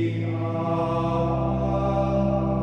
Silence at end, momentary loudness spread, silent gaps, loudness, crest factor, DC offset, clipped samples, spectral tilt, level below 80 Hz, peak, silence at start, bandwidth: 0 s; 4 LU; none; -24 LUFS; 12 dB; under 0.1%; under 0.1%; -9.5 dB/octave; -36 dBFS; -12 dBFS; 0 s; 6.6 kHz